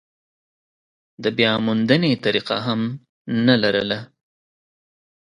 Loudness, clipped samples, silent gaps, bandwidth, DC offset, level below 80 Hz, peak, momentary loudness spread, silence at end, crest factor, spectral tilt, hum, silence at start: -20 LUFS; under 0.1%; 3.09-3.25 s; 10 kHz; under 0.1%; -60 dBFS; 0 dBFS; 9 LU; 1.35 s; 22 dB; -7 dB/octave; none; 1.2 s